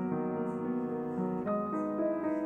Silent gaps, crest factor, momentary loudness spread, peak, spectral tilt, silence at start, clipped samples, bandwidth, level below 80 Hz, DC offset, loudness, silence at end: none; 12 dB; 2 LU; -22 dBFS; -10.5 dB/octave; 0 s; under 0.1%; 8.4 kHz; -68 dBFS; under 0.1%; -34 LUFS; 0 s